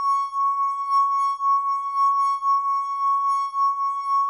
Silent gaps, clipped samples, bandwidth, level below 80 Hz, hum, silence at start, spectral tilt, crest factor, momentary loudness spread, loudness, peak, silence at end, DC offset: none; under 0.1%; 10.5 kHz; -78 dBFS; none; 0 s; 2.5 dB/octave; 8 dB; 3 LU; -22 LUFS; -14 dBFS; 0 s; under 0.1%